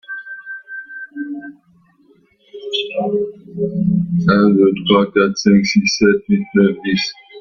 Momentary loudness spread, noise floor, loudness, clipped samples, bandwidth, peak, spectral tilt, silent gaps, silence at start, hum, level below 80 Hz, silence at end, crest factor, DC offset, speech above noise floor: 17 LU; -54 dBFS; -15 LUFS; under 0.1%; 7 kHz; 0 dBFS; -5.5 dB/octave; none; 0.1 s; none; -52 dBFS; 0 s; 16 dB; under 0.1%; 39 dB